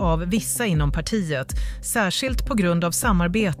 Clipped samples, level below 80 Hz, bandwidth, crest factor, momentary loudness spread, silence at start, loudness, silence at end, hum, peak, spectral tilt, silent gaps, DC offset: under 0.1%; -30 dBFS; 16 kHz; 14 dB; 6 LU; 0 s; -22 LUFS; 0 s; none; -8 dBFS; -4.5 dB/octave; none; under 0.1%